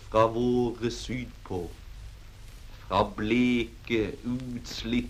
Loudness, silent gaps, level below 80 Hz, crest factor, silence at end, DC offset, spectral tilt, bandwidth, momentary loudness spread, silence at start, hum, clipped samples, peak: -29 LUFS; none; -44 dBFS; 20 dB; 0 s; under 0.1%; -6 dB/octave; 15 kHz; 24 LU; 0 s; none; under 0.1%; -8 dBFS